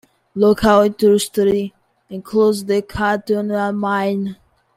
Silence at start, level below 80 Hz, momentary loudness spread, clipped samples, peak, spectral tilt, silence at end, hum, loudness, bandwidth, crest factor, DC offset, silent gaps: 0.35 s; -46 dBFS; 15 LU; under 0.1%; -2 dBFS; -5.5 dB/octave; 0.4 s; none; -17 LUFS; 15.5 kHz; 16 dB; under 0.1%; none